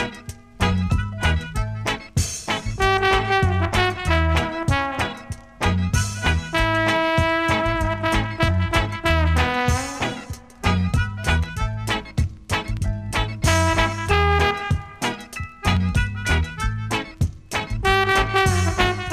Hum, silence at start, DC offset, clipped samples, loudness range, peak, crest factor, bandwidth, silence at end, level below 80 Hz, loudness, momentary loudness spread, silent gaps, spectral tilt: none; 0 s; under 0.1%; under 0.1%; 3 LU; -4 dBFS; 18 dB; 15 kHz; 0 s; -30 dBFS; -21 LUFS; 8 LU; none; -5 dB/octave